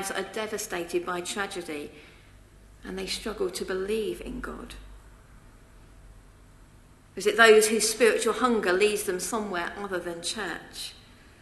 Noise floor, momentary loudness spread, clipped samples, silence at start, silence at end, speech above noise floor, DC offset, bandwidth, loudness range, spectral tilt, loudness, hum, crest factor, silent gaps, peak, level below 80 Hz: -54 dBFS; 19 LU; under 0.1%; 0 s; 0.4 s; 27 dB; under 0.1%; 13 kHz; 13 LU; -2.5 dB/octave; -26 LUFS; none; 26 dB; none; -2 dBFS; -52 dBFS